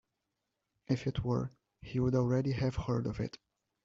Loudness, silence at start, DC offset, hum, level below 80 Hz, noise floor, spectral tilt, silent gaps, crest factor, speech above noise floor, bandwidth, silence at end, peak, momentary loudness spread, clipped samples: -34 LUFS; 0.9 s; under 0.1%; none; -54 dBFS; -86 dBFS; -8 dB/octave; none; 16 dB; 53 dB; 7.4 kHz; 0.5 s; -18 dBFS; 12 LU; under 0.1%